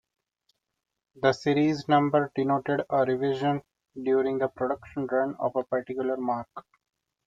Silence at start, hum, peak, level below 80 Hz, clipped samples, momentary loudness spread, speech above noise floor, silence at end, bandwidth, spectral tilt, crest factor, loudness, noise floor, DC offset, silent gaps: 1.15 s; none; -8 dBFS; -68 dBFS; under 0.1%; 9 LU; 49 dB; 0.65 s; 7.8 kHz; -7 dB/octave; 18 dB; -27 LUFS; -75 dBFS; under 0.1%; none